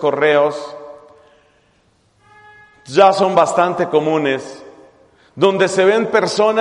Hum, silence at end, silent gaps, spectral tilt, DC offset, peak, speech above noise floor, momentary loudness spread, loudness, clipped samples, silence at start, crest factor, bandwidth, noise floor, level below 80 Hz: none; 0 s; none; -4.5 dB/octave; under 0.1%; 0 dBFS; 43 dB; 13 LU; -15 LUFS; under 0.1%; 0 s; 16 dB; 11 kHz; -57 dBFS; -62 dBFS